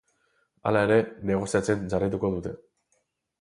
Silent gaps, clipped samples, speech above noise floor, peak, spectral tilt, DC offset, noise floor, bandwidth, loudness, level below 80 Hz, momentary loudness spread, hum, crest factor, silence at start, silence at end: none; under 0.1%; 48 dB; -8 dBFS; -6.5 dB/octave; under 0.1%; -73 dBFS; 11.5 kHz; -26 LUFS; -52 dBFS; 12 LU; none; 18 dB; 0.65 s; 0.85 s